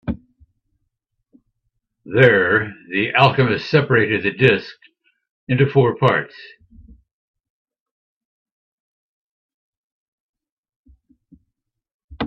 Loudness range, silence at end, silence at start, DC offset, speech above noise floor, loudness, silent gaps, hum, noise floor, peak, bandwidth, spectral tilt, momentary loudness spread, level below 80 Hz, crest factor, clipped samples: 6 LU; 0 s; 0.05 s; under 0.1%; 63 dB; -16 LUFS; 5.31-5.47 s, 7.13-7.34 s, 7.50-7.65 s, 7.80-8.45 s, 8.51-10.33 s, 10.52-10.63 s, 10.76-10.84 s, 11.94-12.08 s; none; -79 dBFS; 0 dBFS; 6.6 kHz; -8 dB/octave; 11 LU; -52 dBFS; 22 dB; under 0.1%